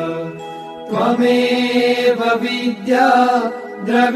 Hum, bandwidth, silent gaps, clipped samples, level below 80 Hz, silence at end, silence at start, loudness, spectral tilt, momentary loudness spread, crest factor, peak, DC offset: none; 13.5 kHz; none; under 0.1%; -64 dBFS; 0 s; 0 s; -16 LUFS; -5 dB/octave; 14 LU; 16 dB; 0 dBFS; under 0.1%